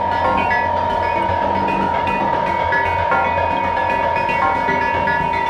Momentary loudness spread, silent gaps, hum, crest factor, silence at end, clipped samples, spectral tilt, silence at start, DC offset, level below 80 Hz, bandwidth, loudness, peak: 2 LU; none; none; 14 dB; 0 s; under 0.1%; -6 dB/octave; 0 s; under 0.1%; -40 dBFS; 9.6 kHz; -17 LUFS; -4 dBFS